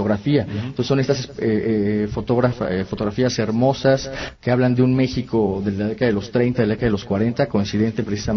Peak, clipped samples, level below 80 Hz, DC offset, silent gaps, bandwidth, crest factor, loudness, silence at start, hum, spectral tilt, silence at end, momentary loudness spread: -4 dBFS; under 0.1%; -44 dBFS; under 0.1%; none; 6.6 kHz; 16 dB; -20 LUFS; 0 s; none; -7 dB/octave; 0 s; 6 LU